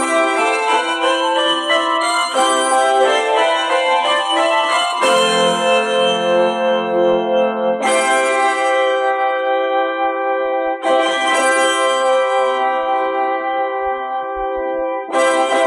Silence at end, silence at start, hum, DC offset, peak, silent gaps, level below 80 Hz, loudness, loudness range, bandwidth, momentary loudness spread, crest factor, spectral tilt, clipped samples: 0 s; 0 s; none; under 0.1%; -4 dBFS; none; -56 dBFS; -15 LUFS; 2 LU; 13 kHz; 5 LU; 12 dB; -2 dB/octave; under 0.1%